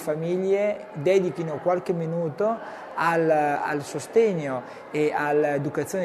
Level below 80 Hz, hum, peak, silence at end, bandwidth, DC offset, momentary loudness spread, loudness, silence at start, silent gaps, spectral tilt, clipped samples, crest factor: -70 dBFS; none; -8 dBFS; 0 s; 13.5 kHz; under 0.1%; 8 LU; -25 LUFS; 0 s; none; -6.5 dB/octave; under 0.1%; 16 dB